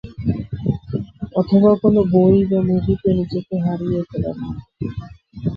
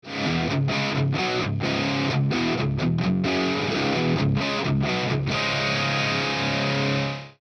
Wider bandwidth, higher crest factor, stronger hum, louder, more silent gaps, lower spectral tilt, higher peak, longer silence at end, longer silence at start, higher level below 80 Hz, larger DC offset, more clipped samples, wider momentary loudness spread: second, 5.2 kHz vs 8.8 kHz; about the same, 16 dB vs 12 dB; neither; first, -19 LUFS vs -24 LUFS; neither; first, -11.5 dB/octave vs -5.5 dB/octave; first, -2 dBFS vs -12 dBFS; about the same, 0 s vs 0.1 s; about the same, 0.05 s vs 0.05 s; first, -40 dBFS vs -48 dBFS; neither; neither; first, 15 LU vs 2 LU